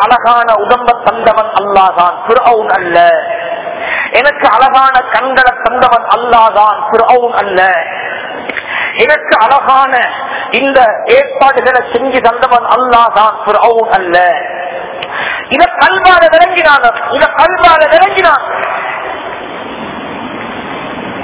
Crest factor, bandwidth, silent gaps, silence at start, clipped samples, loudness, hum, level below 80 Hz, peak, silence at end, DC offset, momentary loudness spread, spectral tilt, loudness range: 8 dB; 4 kHz; none; 0 s; 5%; -8 LUFS; none; -42 dBFS; 0 dBFS; 0 s; under 0.1%; 13 LU; -7 dB/octave; 3 LU